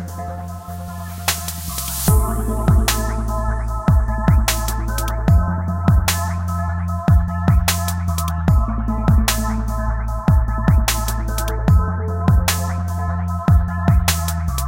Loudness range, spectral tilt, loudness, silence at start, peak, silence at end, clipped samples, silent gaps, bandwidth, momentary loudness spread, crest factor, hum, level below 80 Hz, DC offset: 1 LU; -5 dB/octave; -19 LUFS; 0 s; -2 dBFS; 0 s; under 0.1%; none; 17 kHz; 7 LU; 16 dB; none; -22 dBFS; under 0.1%